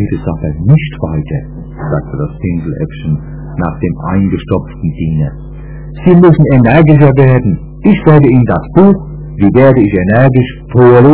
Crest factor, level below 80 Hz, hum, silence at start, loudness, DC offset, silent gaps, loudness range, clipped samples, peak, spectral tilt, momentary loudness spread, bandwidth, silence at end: 8 dB; -26 dBFS; none; 0 s; -9 LUFS; under 0.1%; none; 9 LU; 4%; 0 dBFS; -13 dB/octave; 14 LU; 4 kHz; 0 s